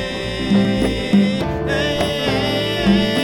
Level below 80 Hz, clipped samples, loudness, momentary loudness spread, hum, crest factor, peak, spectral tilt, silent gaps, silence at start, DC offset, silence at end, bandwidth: -34 dBFS; under 0.1%; -18 LUFS; 5 LU; none; 14 dB; -4 dBFS; -6 dB/octave; none; 0 s; under 0.1%; 0 s; 17 kHz